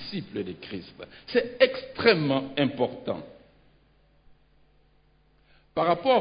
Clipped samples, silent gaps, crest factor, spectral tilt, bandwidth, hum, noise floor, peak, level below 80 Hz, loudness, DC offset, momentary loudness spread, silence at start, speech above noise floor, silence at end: under 0.1%; none; 26 dB; -9.5 dB/octave; 5.2 kHz; none; -62 dBFS; -2 dBFS; -60 dBFS; -26 LUFS; under 0.1%; 17 LU; 0 s; 36 dB; 0 s